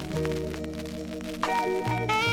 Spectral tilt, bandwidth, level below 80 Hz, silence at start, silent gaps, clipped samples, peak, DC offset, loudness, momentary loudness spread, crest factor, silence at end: -5 dB/octave; 17.5 kHz; -46 dBFS; 0 s; none; under 0.1%; -10 dBFS; under 0.1%; -29 LUFS; 9 LU; 18 dB; 0 s